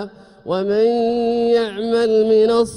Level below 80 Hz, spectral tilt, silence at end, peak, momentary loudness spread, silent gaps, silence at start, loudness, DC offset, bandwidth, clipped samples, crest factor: -54 dBFS; -5.5 dB/octave; 0 s; -6 dBFS; 10 LU; none; 0 s; -17 LUFS; under 0.1%; 11 kHz; under 0.1%; 12 dB